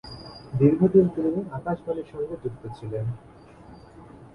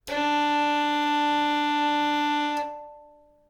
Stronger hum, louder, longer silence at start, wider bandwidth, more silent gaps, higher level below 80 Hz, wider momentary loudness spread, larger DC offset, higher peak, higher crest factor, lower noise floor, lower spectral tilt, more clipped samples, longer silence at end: neither; about the same, -25 LUFS vs -24 LUFS; about the same, 0.05 s vs 0.05 s; second, 10.5 kHz vs 16 kHz; neither; first, -54 dBFS vs -64 dBFS; first, 18 LU vs 6 LU; neither; first, -6 dBFS vs -14 dBFS; first, 20 dB vs 10 dB; second, -47 dBFS vs -54 dBFS; first, -10 dB/octave vs -2.5 dB/octave; neither; second, 0.05 s vs 0.45 s